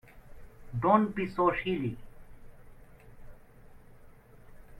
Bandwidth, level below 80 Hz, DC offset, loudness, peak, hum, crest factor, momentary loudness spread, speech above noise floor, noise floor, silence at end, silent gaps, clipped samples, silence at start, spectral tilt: 14 kHz; -54 dBFS; under 0.1%; -29 LUFS; -12 dBFS; none; 22 dB; 14 LU; 25 dB; -53 dBFS; 0 s; none; under 0.1%; 0.15 s; -8.5 dB/octave